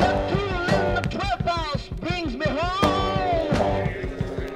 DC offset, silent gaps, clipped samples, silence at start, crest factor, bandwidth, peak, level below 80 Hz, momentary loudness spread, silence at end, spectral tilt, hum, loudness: under 0.1%; none; under 0.1%; 0 s; 20 dB; 16 kHz; -4 dBFS; -34 dBFS; 7 LU; 0 s; -6 dB/octave; none; -24 LUFS